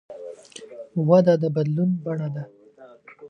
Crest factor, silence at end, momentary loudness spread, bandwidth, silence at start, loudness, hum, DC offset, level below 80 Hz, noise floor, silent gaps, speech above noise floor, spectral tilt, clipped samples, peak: 20 dB; 0 s; 23 LU; 9.4 kHz; 0.1 s; -22 LUFS; none; under 0.1%; -72 dBFS; -49 dBFS; none; 29 dB; -8.5 dB/octave; under 0.1%; -4 dBFS